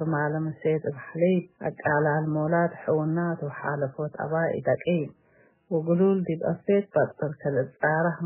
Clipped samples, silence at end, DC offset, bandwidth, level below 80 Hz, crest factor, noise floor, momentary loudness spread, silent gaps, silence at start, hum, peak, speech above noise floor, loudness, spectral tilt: under 0.1%; 0 s; under 0.1%; 3.2 kHz; -66 dBFS; 16 dB; -61 dBFS; 7 LU; none; 0 s; none; -10 dBFS; 36 dB; -26 LUFS; -12 dB/octave